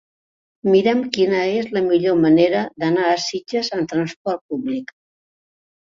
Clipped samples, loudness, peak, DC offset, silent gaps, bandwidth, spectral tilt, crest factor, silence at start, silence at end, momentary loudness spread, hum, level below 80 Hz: under 0.1%; -19 LUFS; -2 dBFS; under 0.1%; 4.16-4.25 s, 4.41-4.49 s; 7.6 kHz; -5.5 dB/octave; 18 dB; 0.65 s; 1 s; 10 LU; none; -62 dBFS